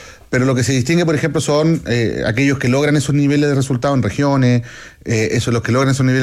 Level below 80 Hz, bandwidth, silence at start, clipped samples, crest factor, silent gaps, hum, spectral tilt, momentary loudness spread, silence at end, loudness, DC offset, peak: -44 dBFS; 13.5 kHz; 0 s; under 0.1%; 10 dB; none; none; -6 dB/octave; 4 LU; 0 s; -16 LUFS; under 0.1%; -4 dBFS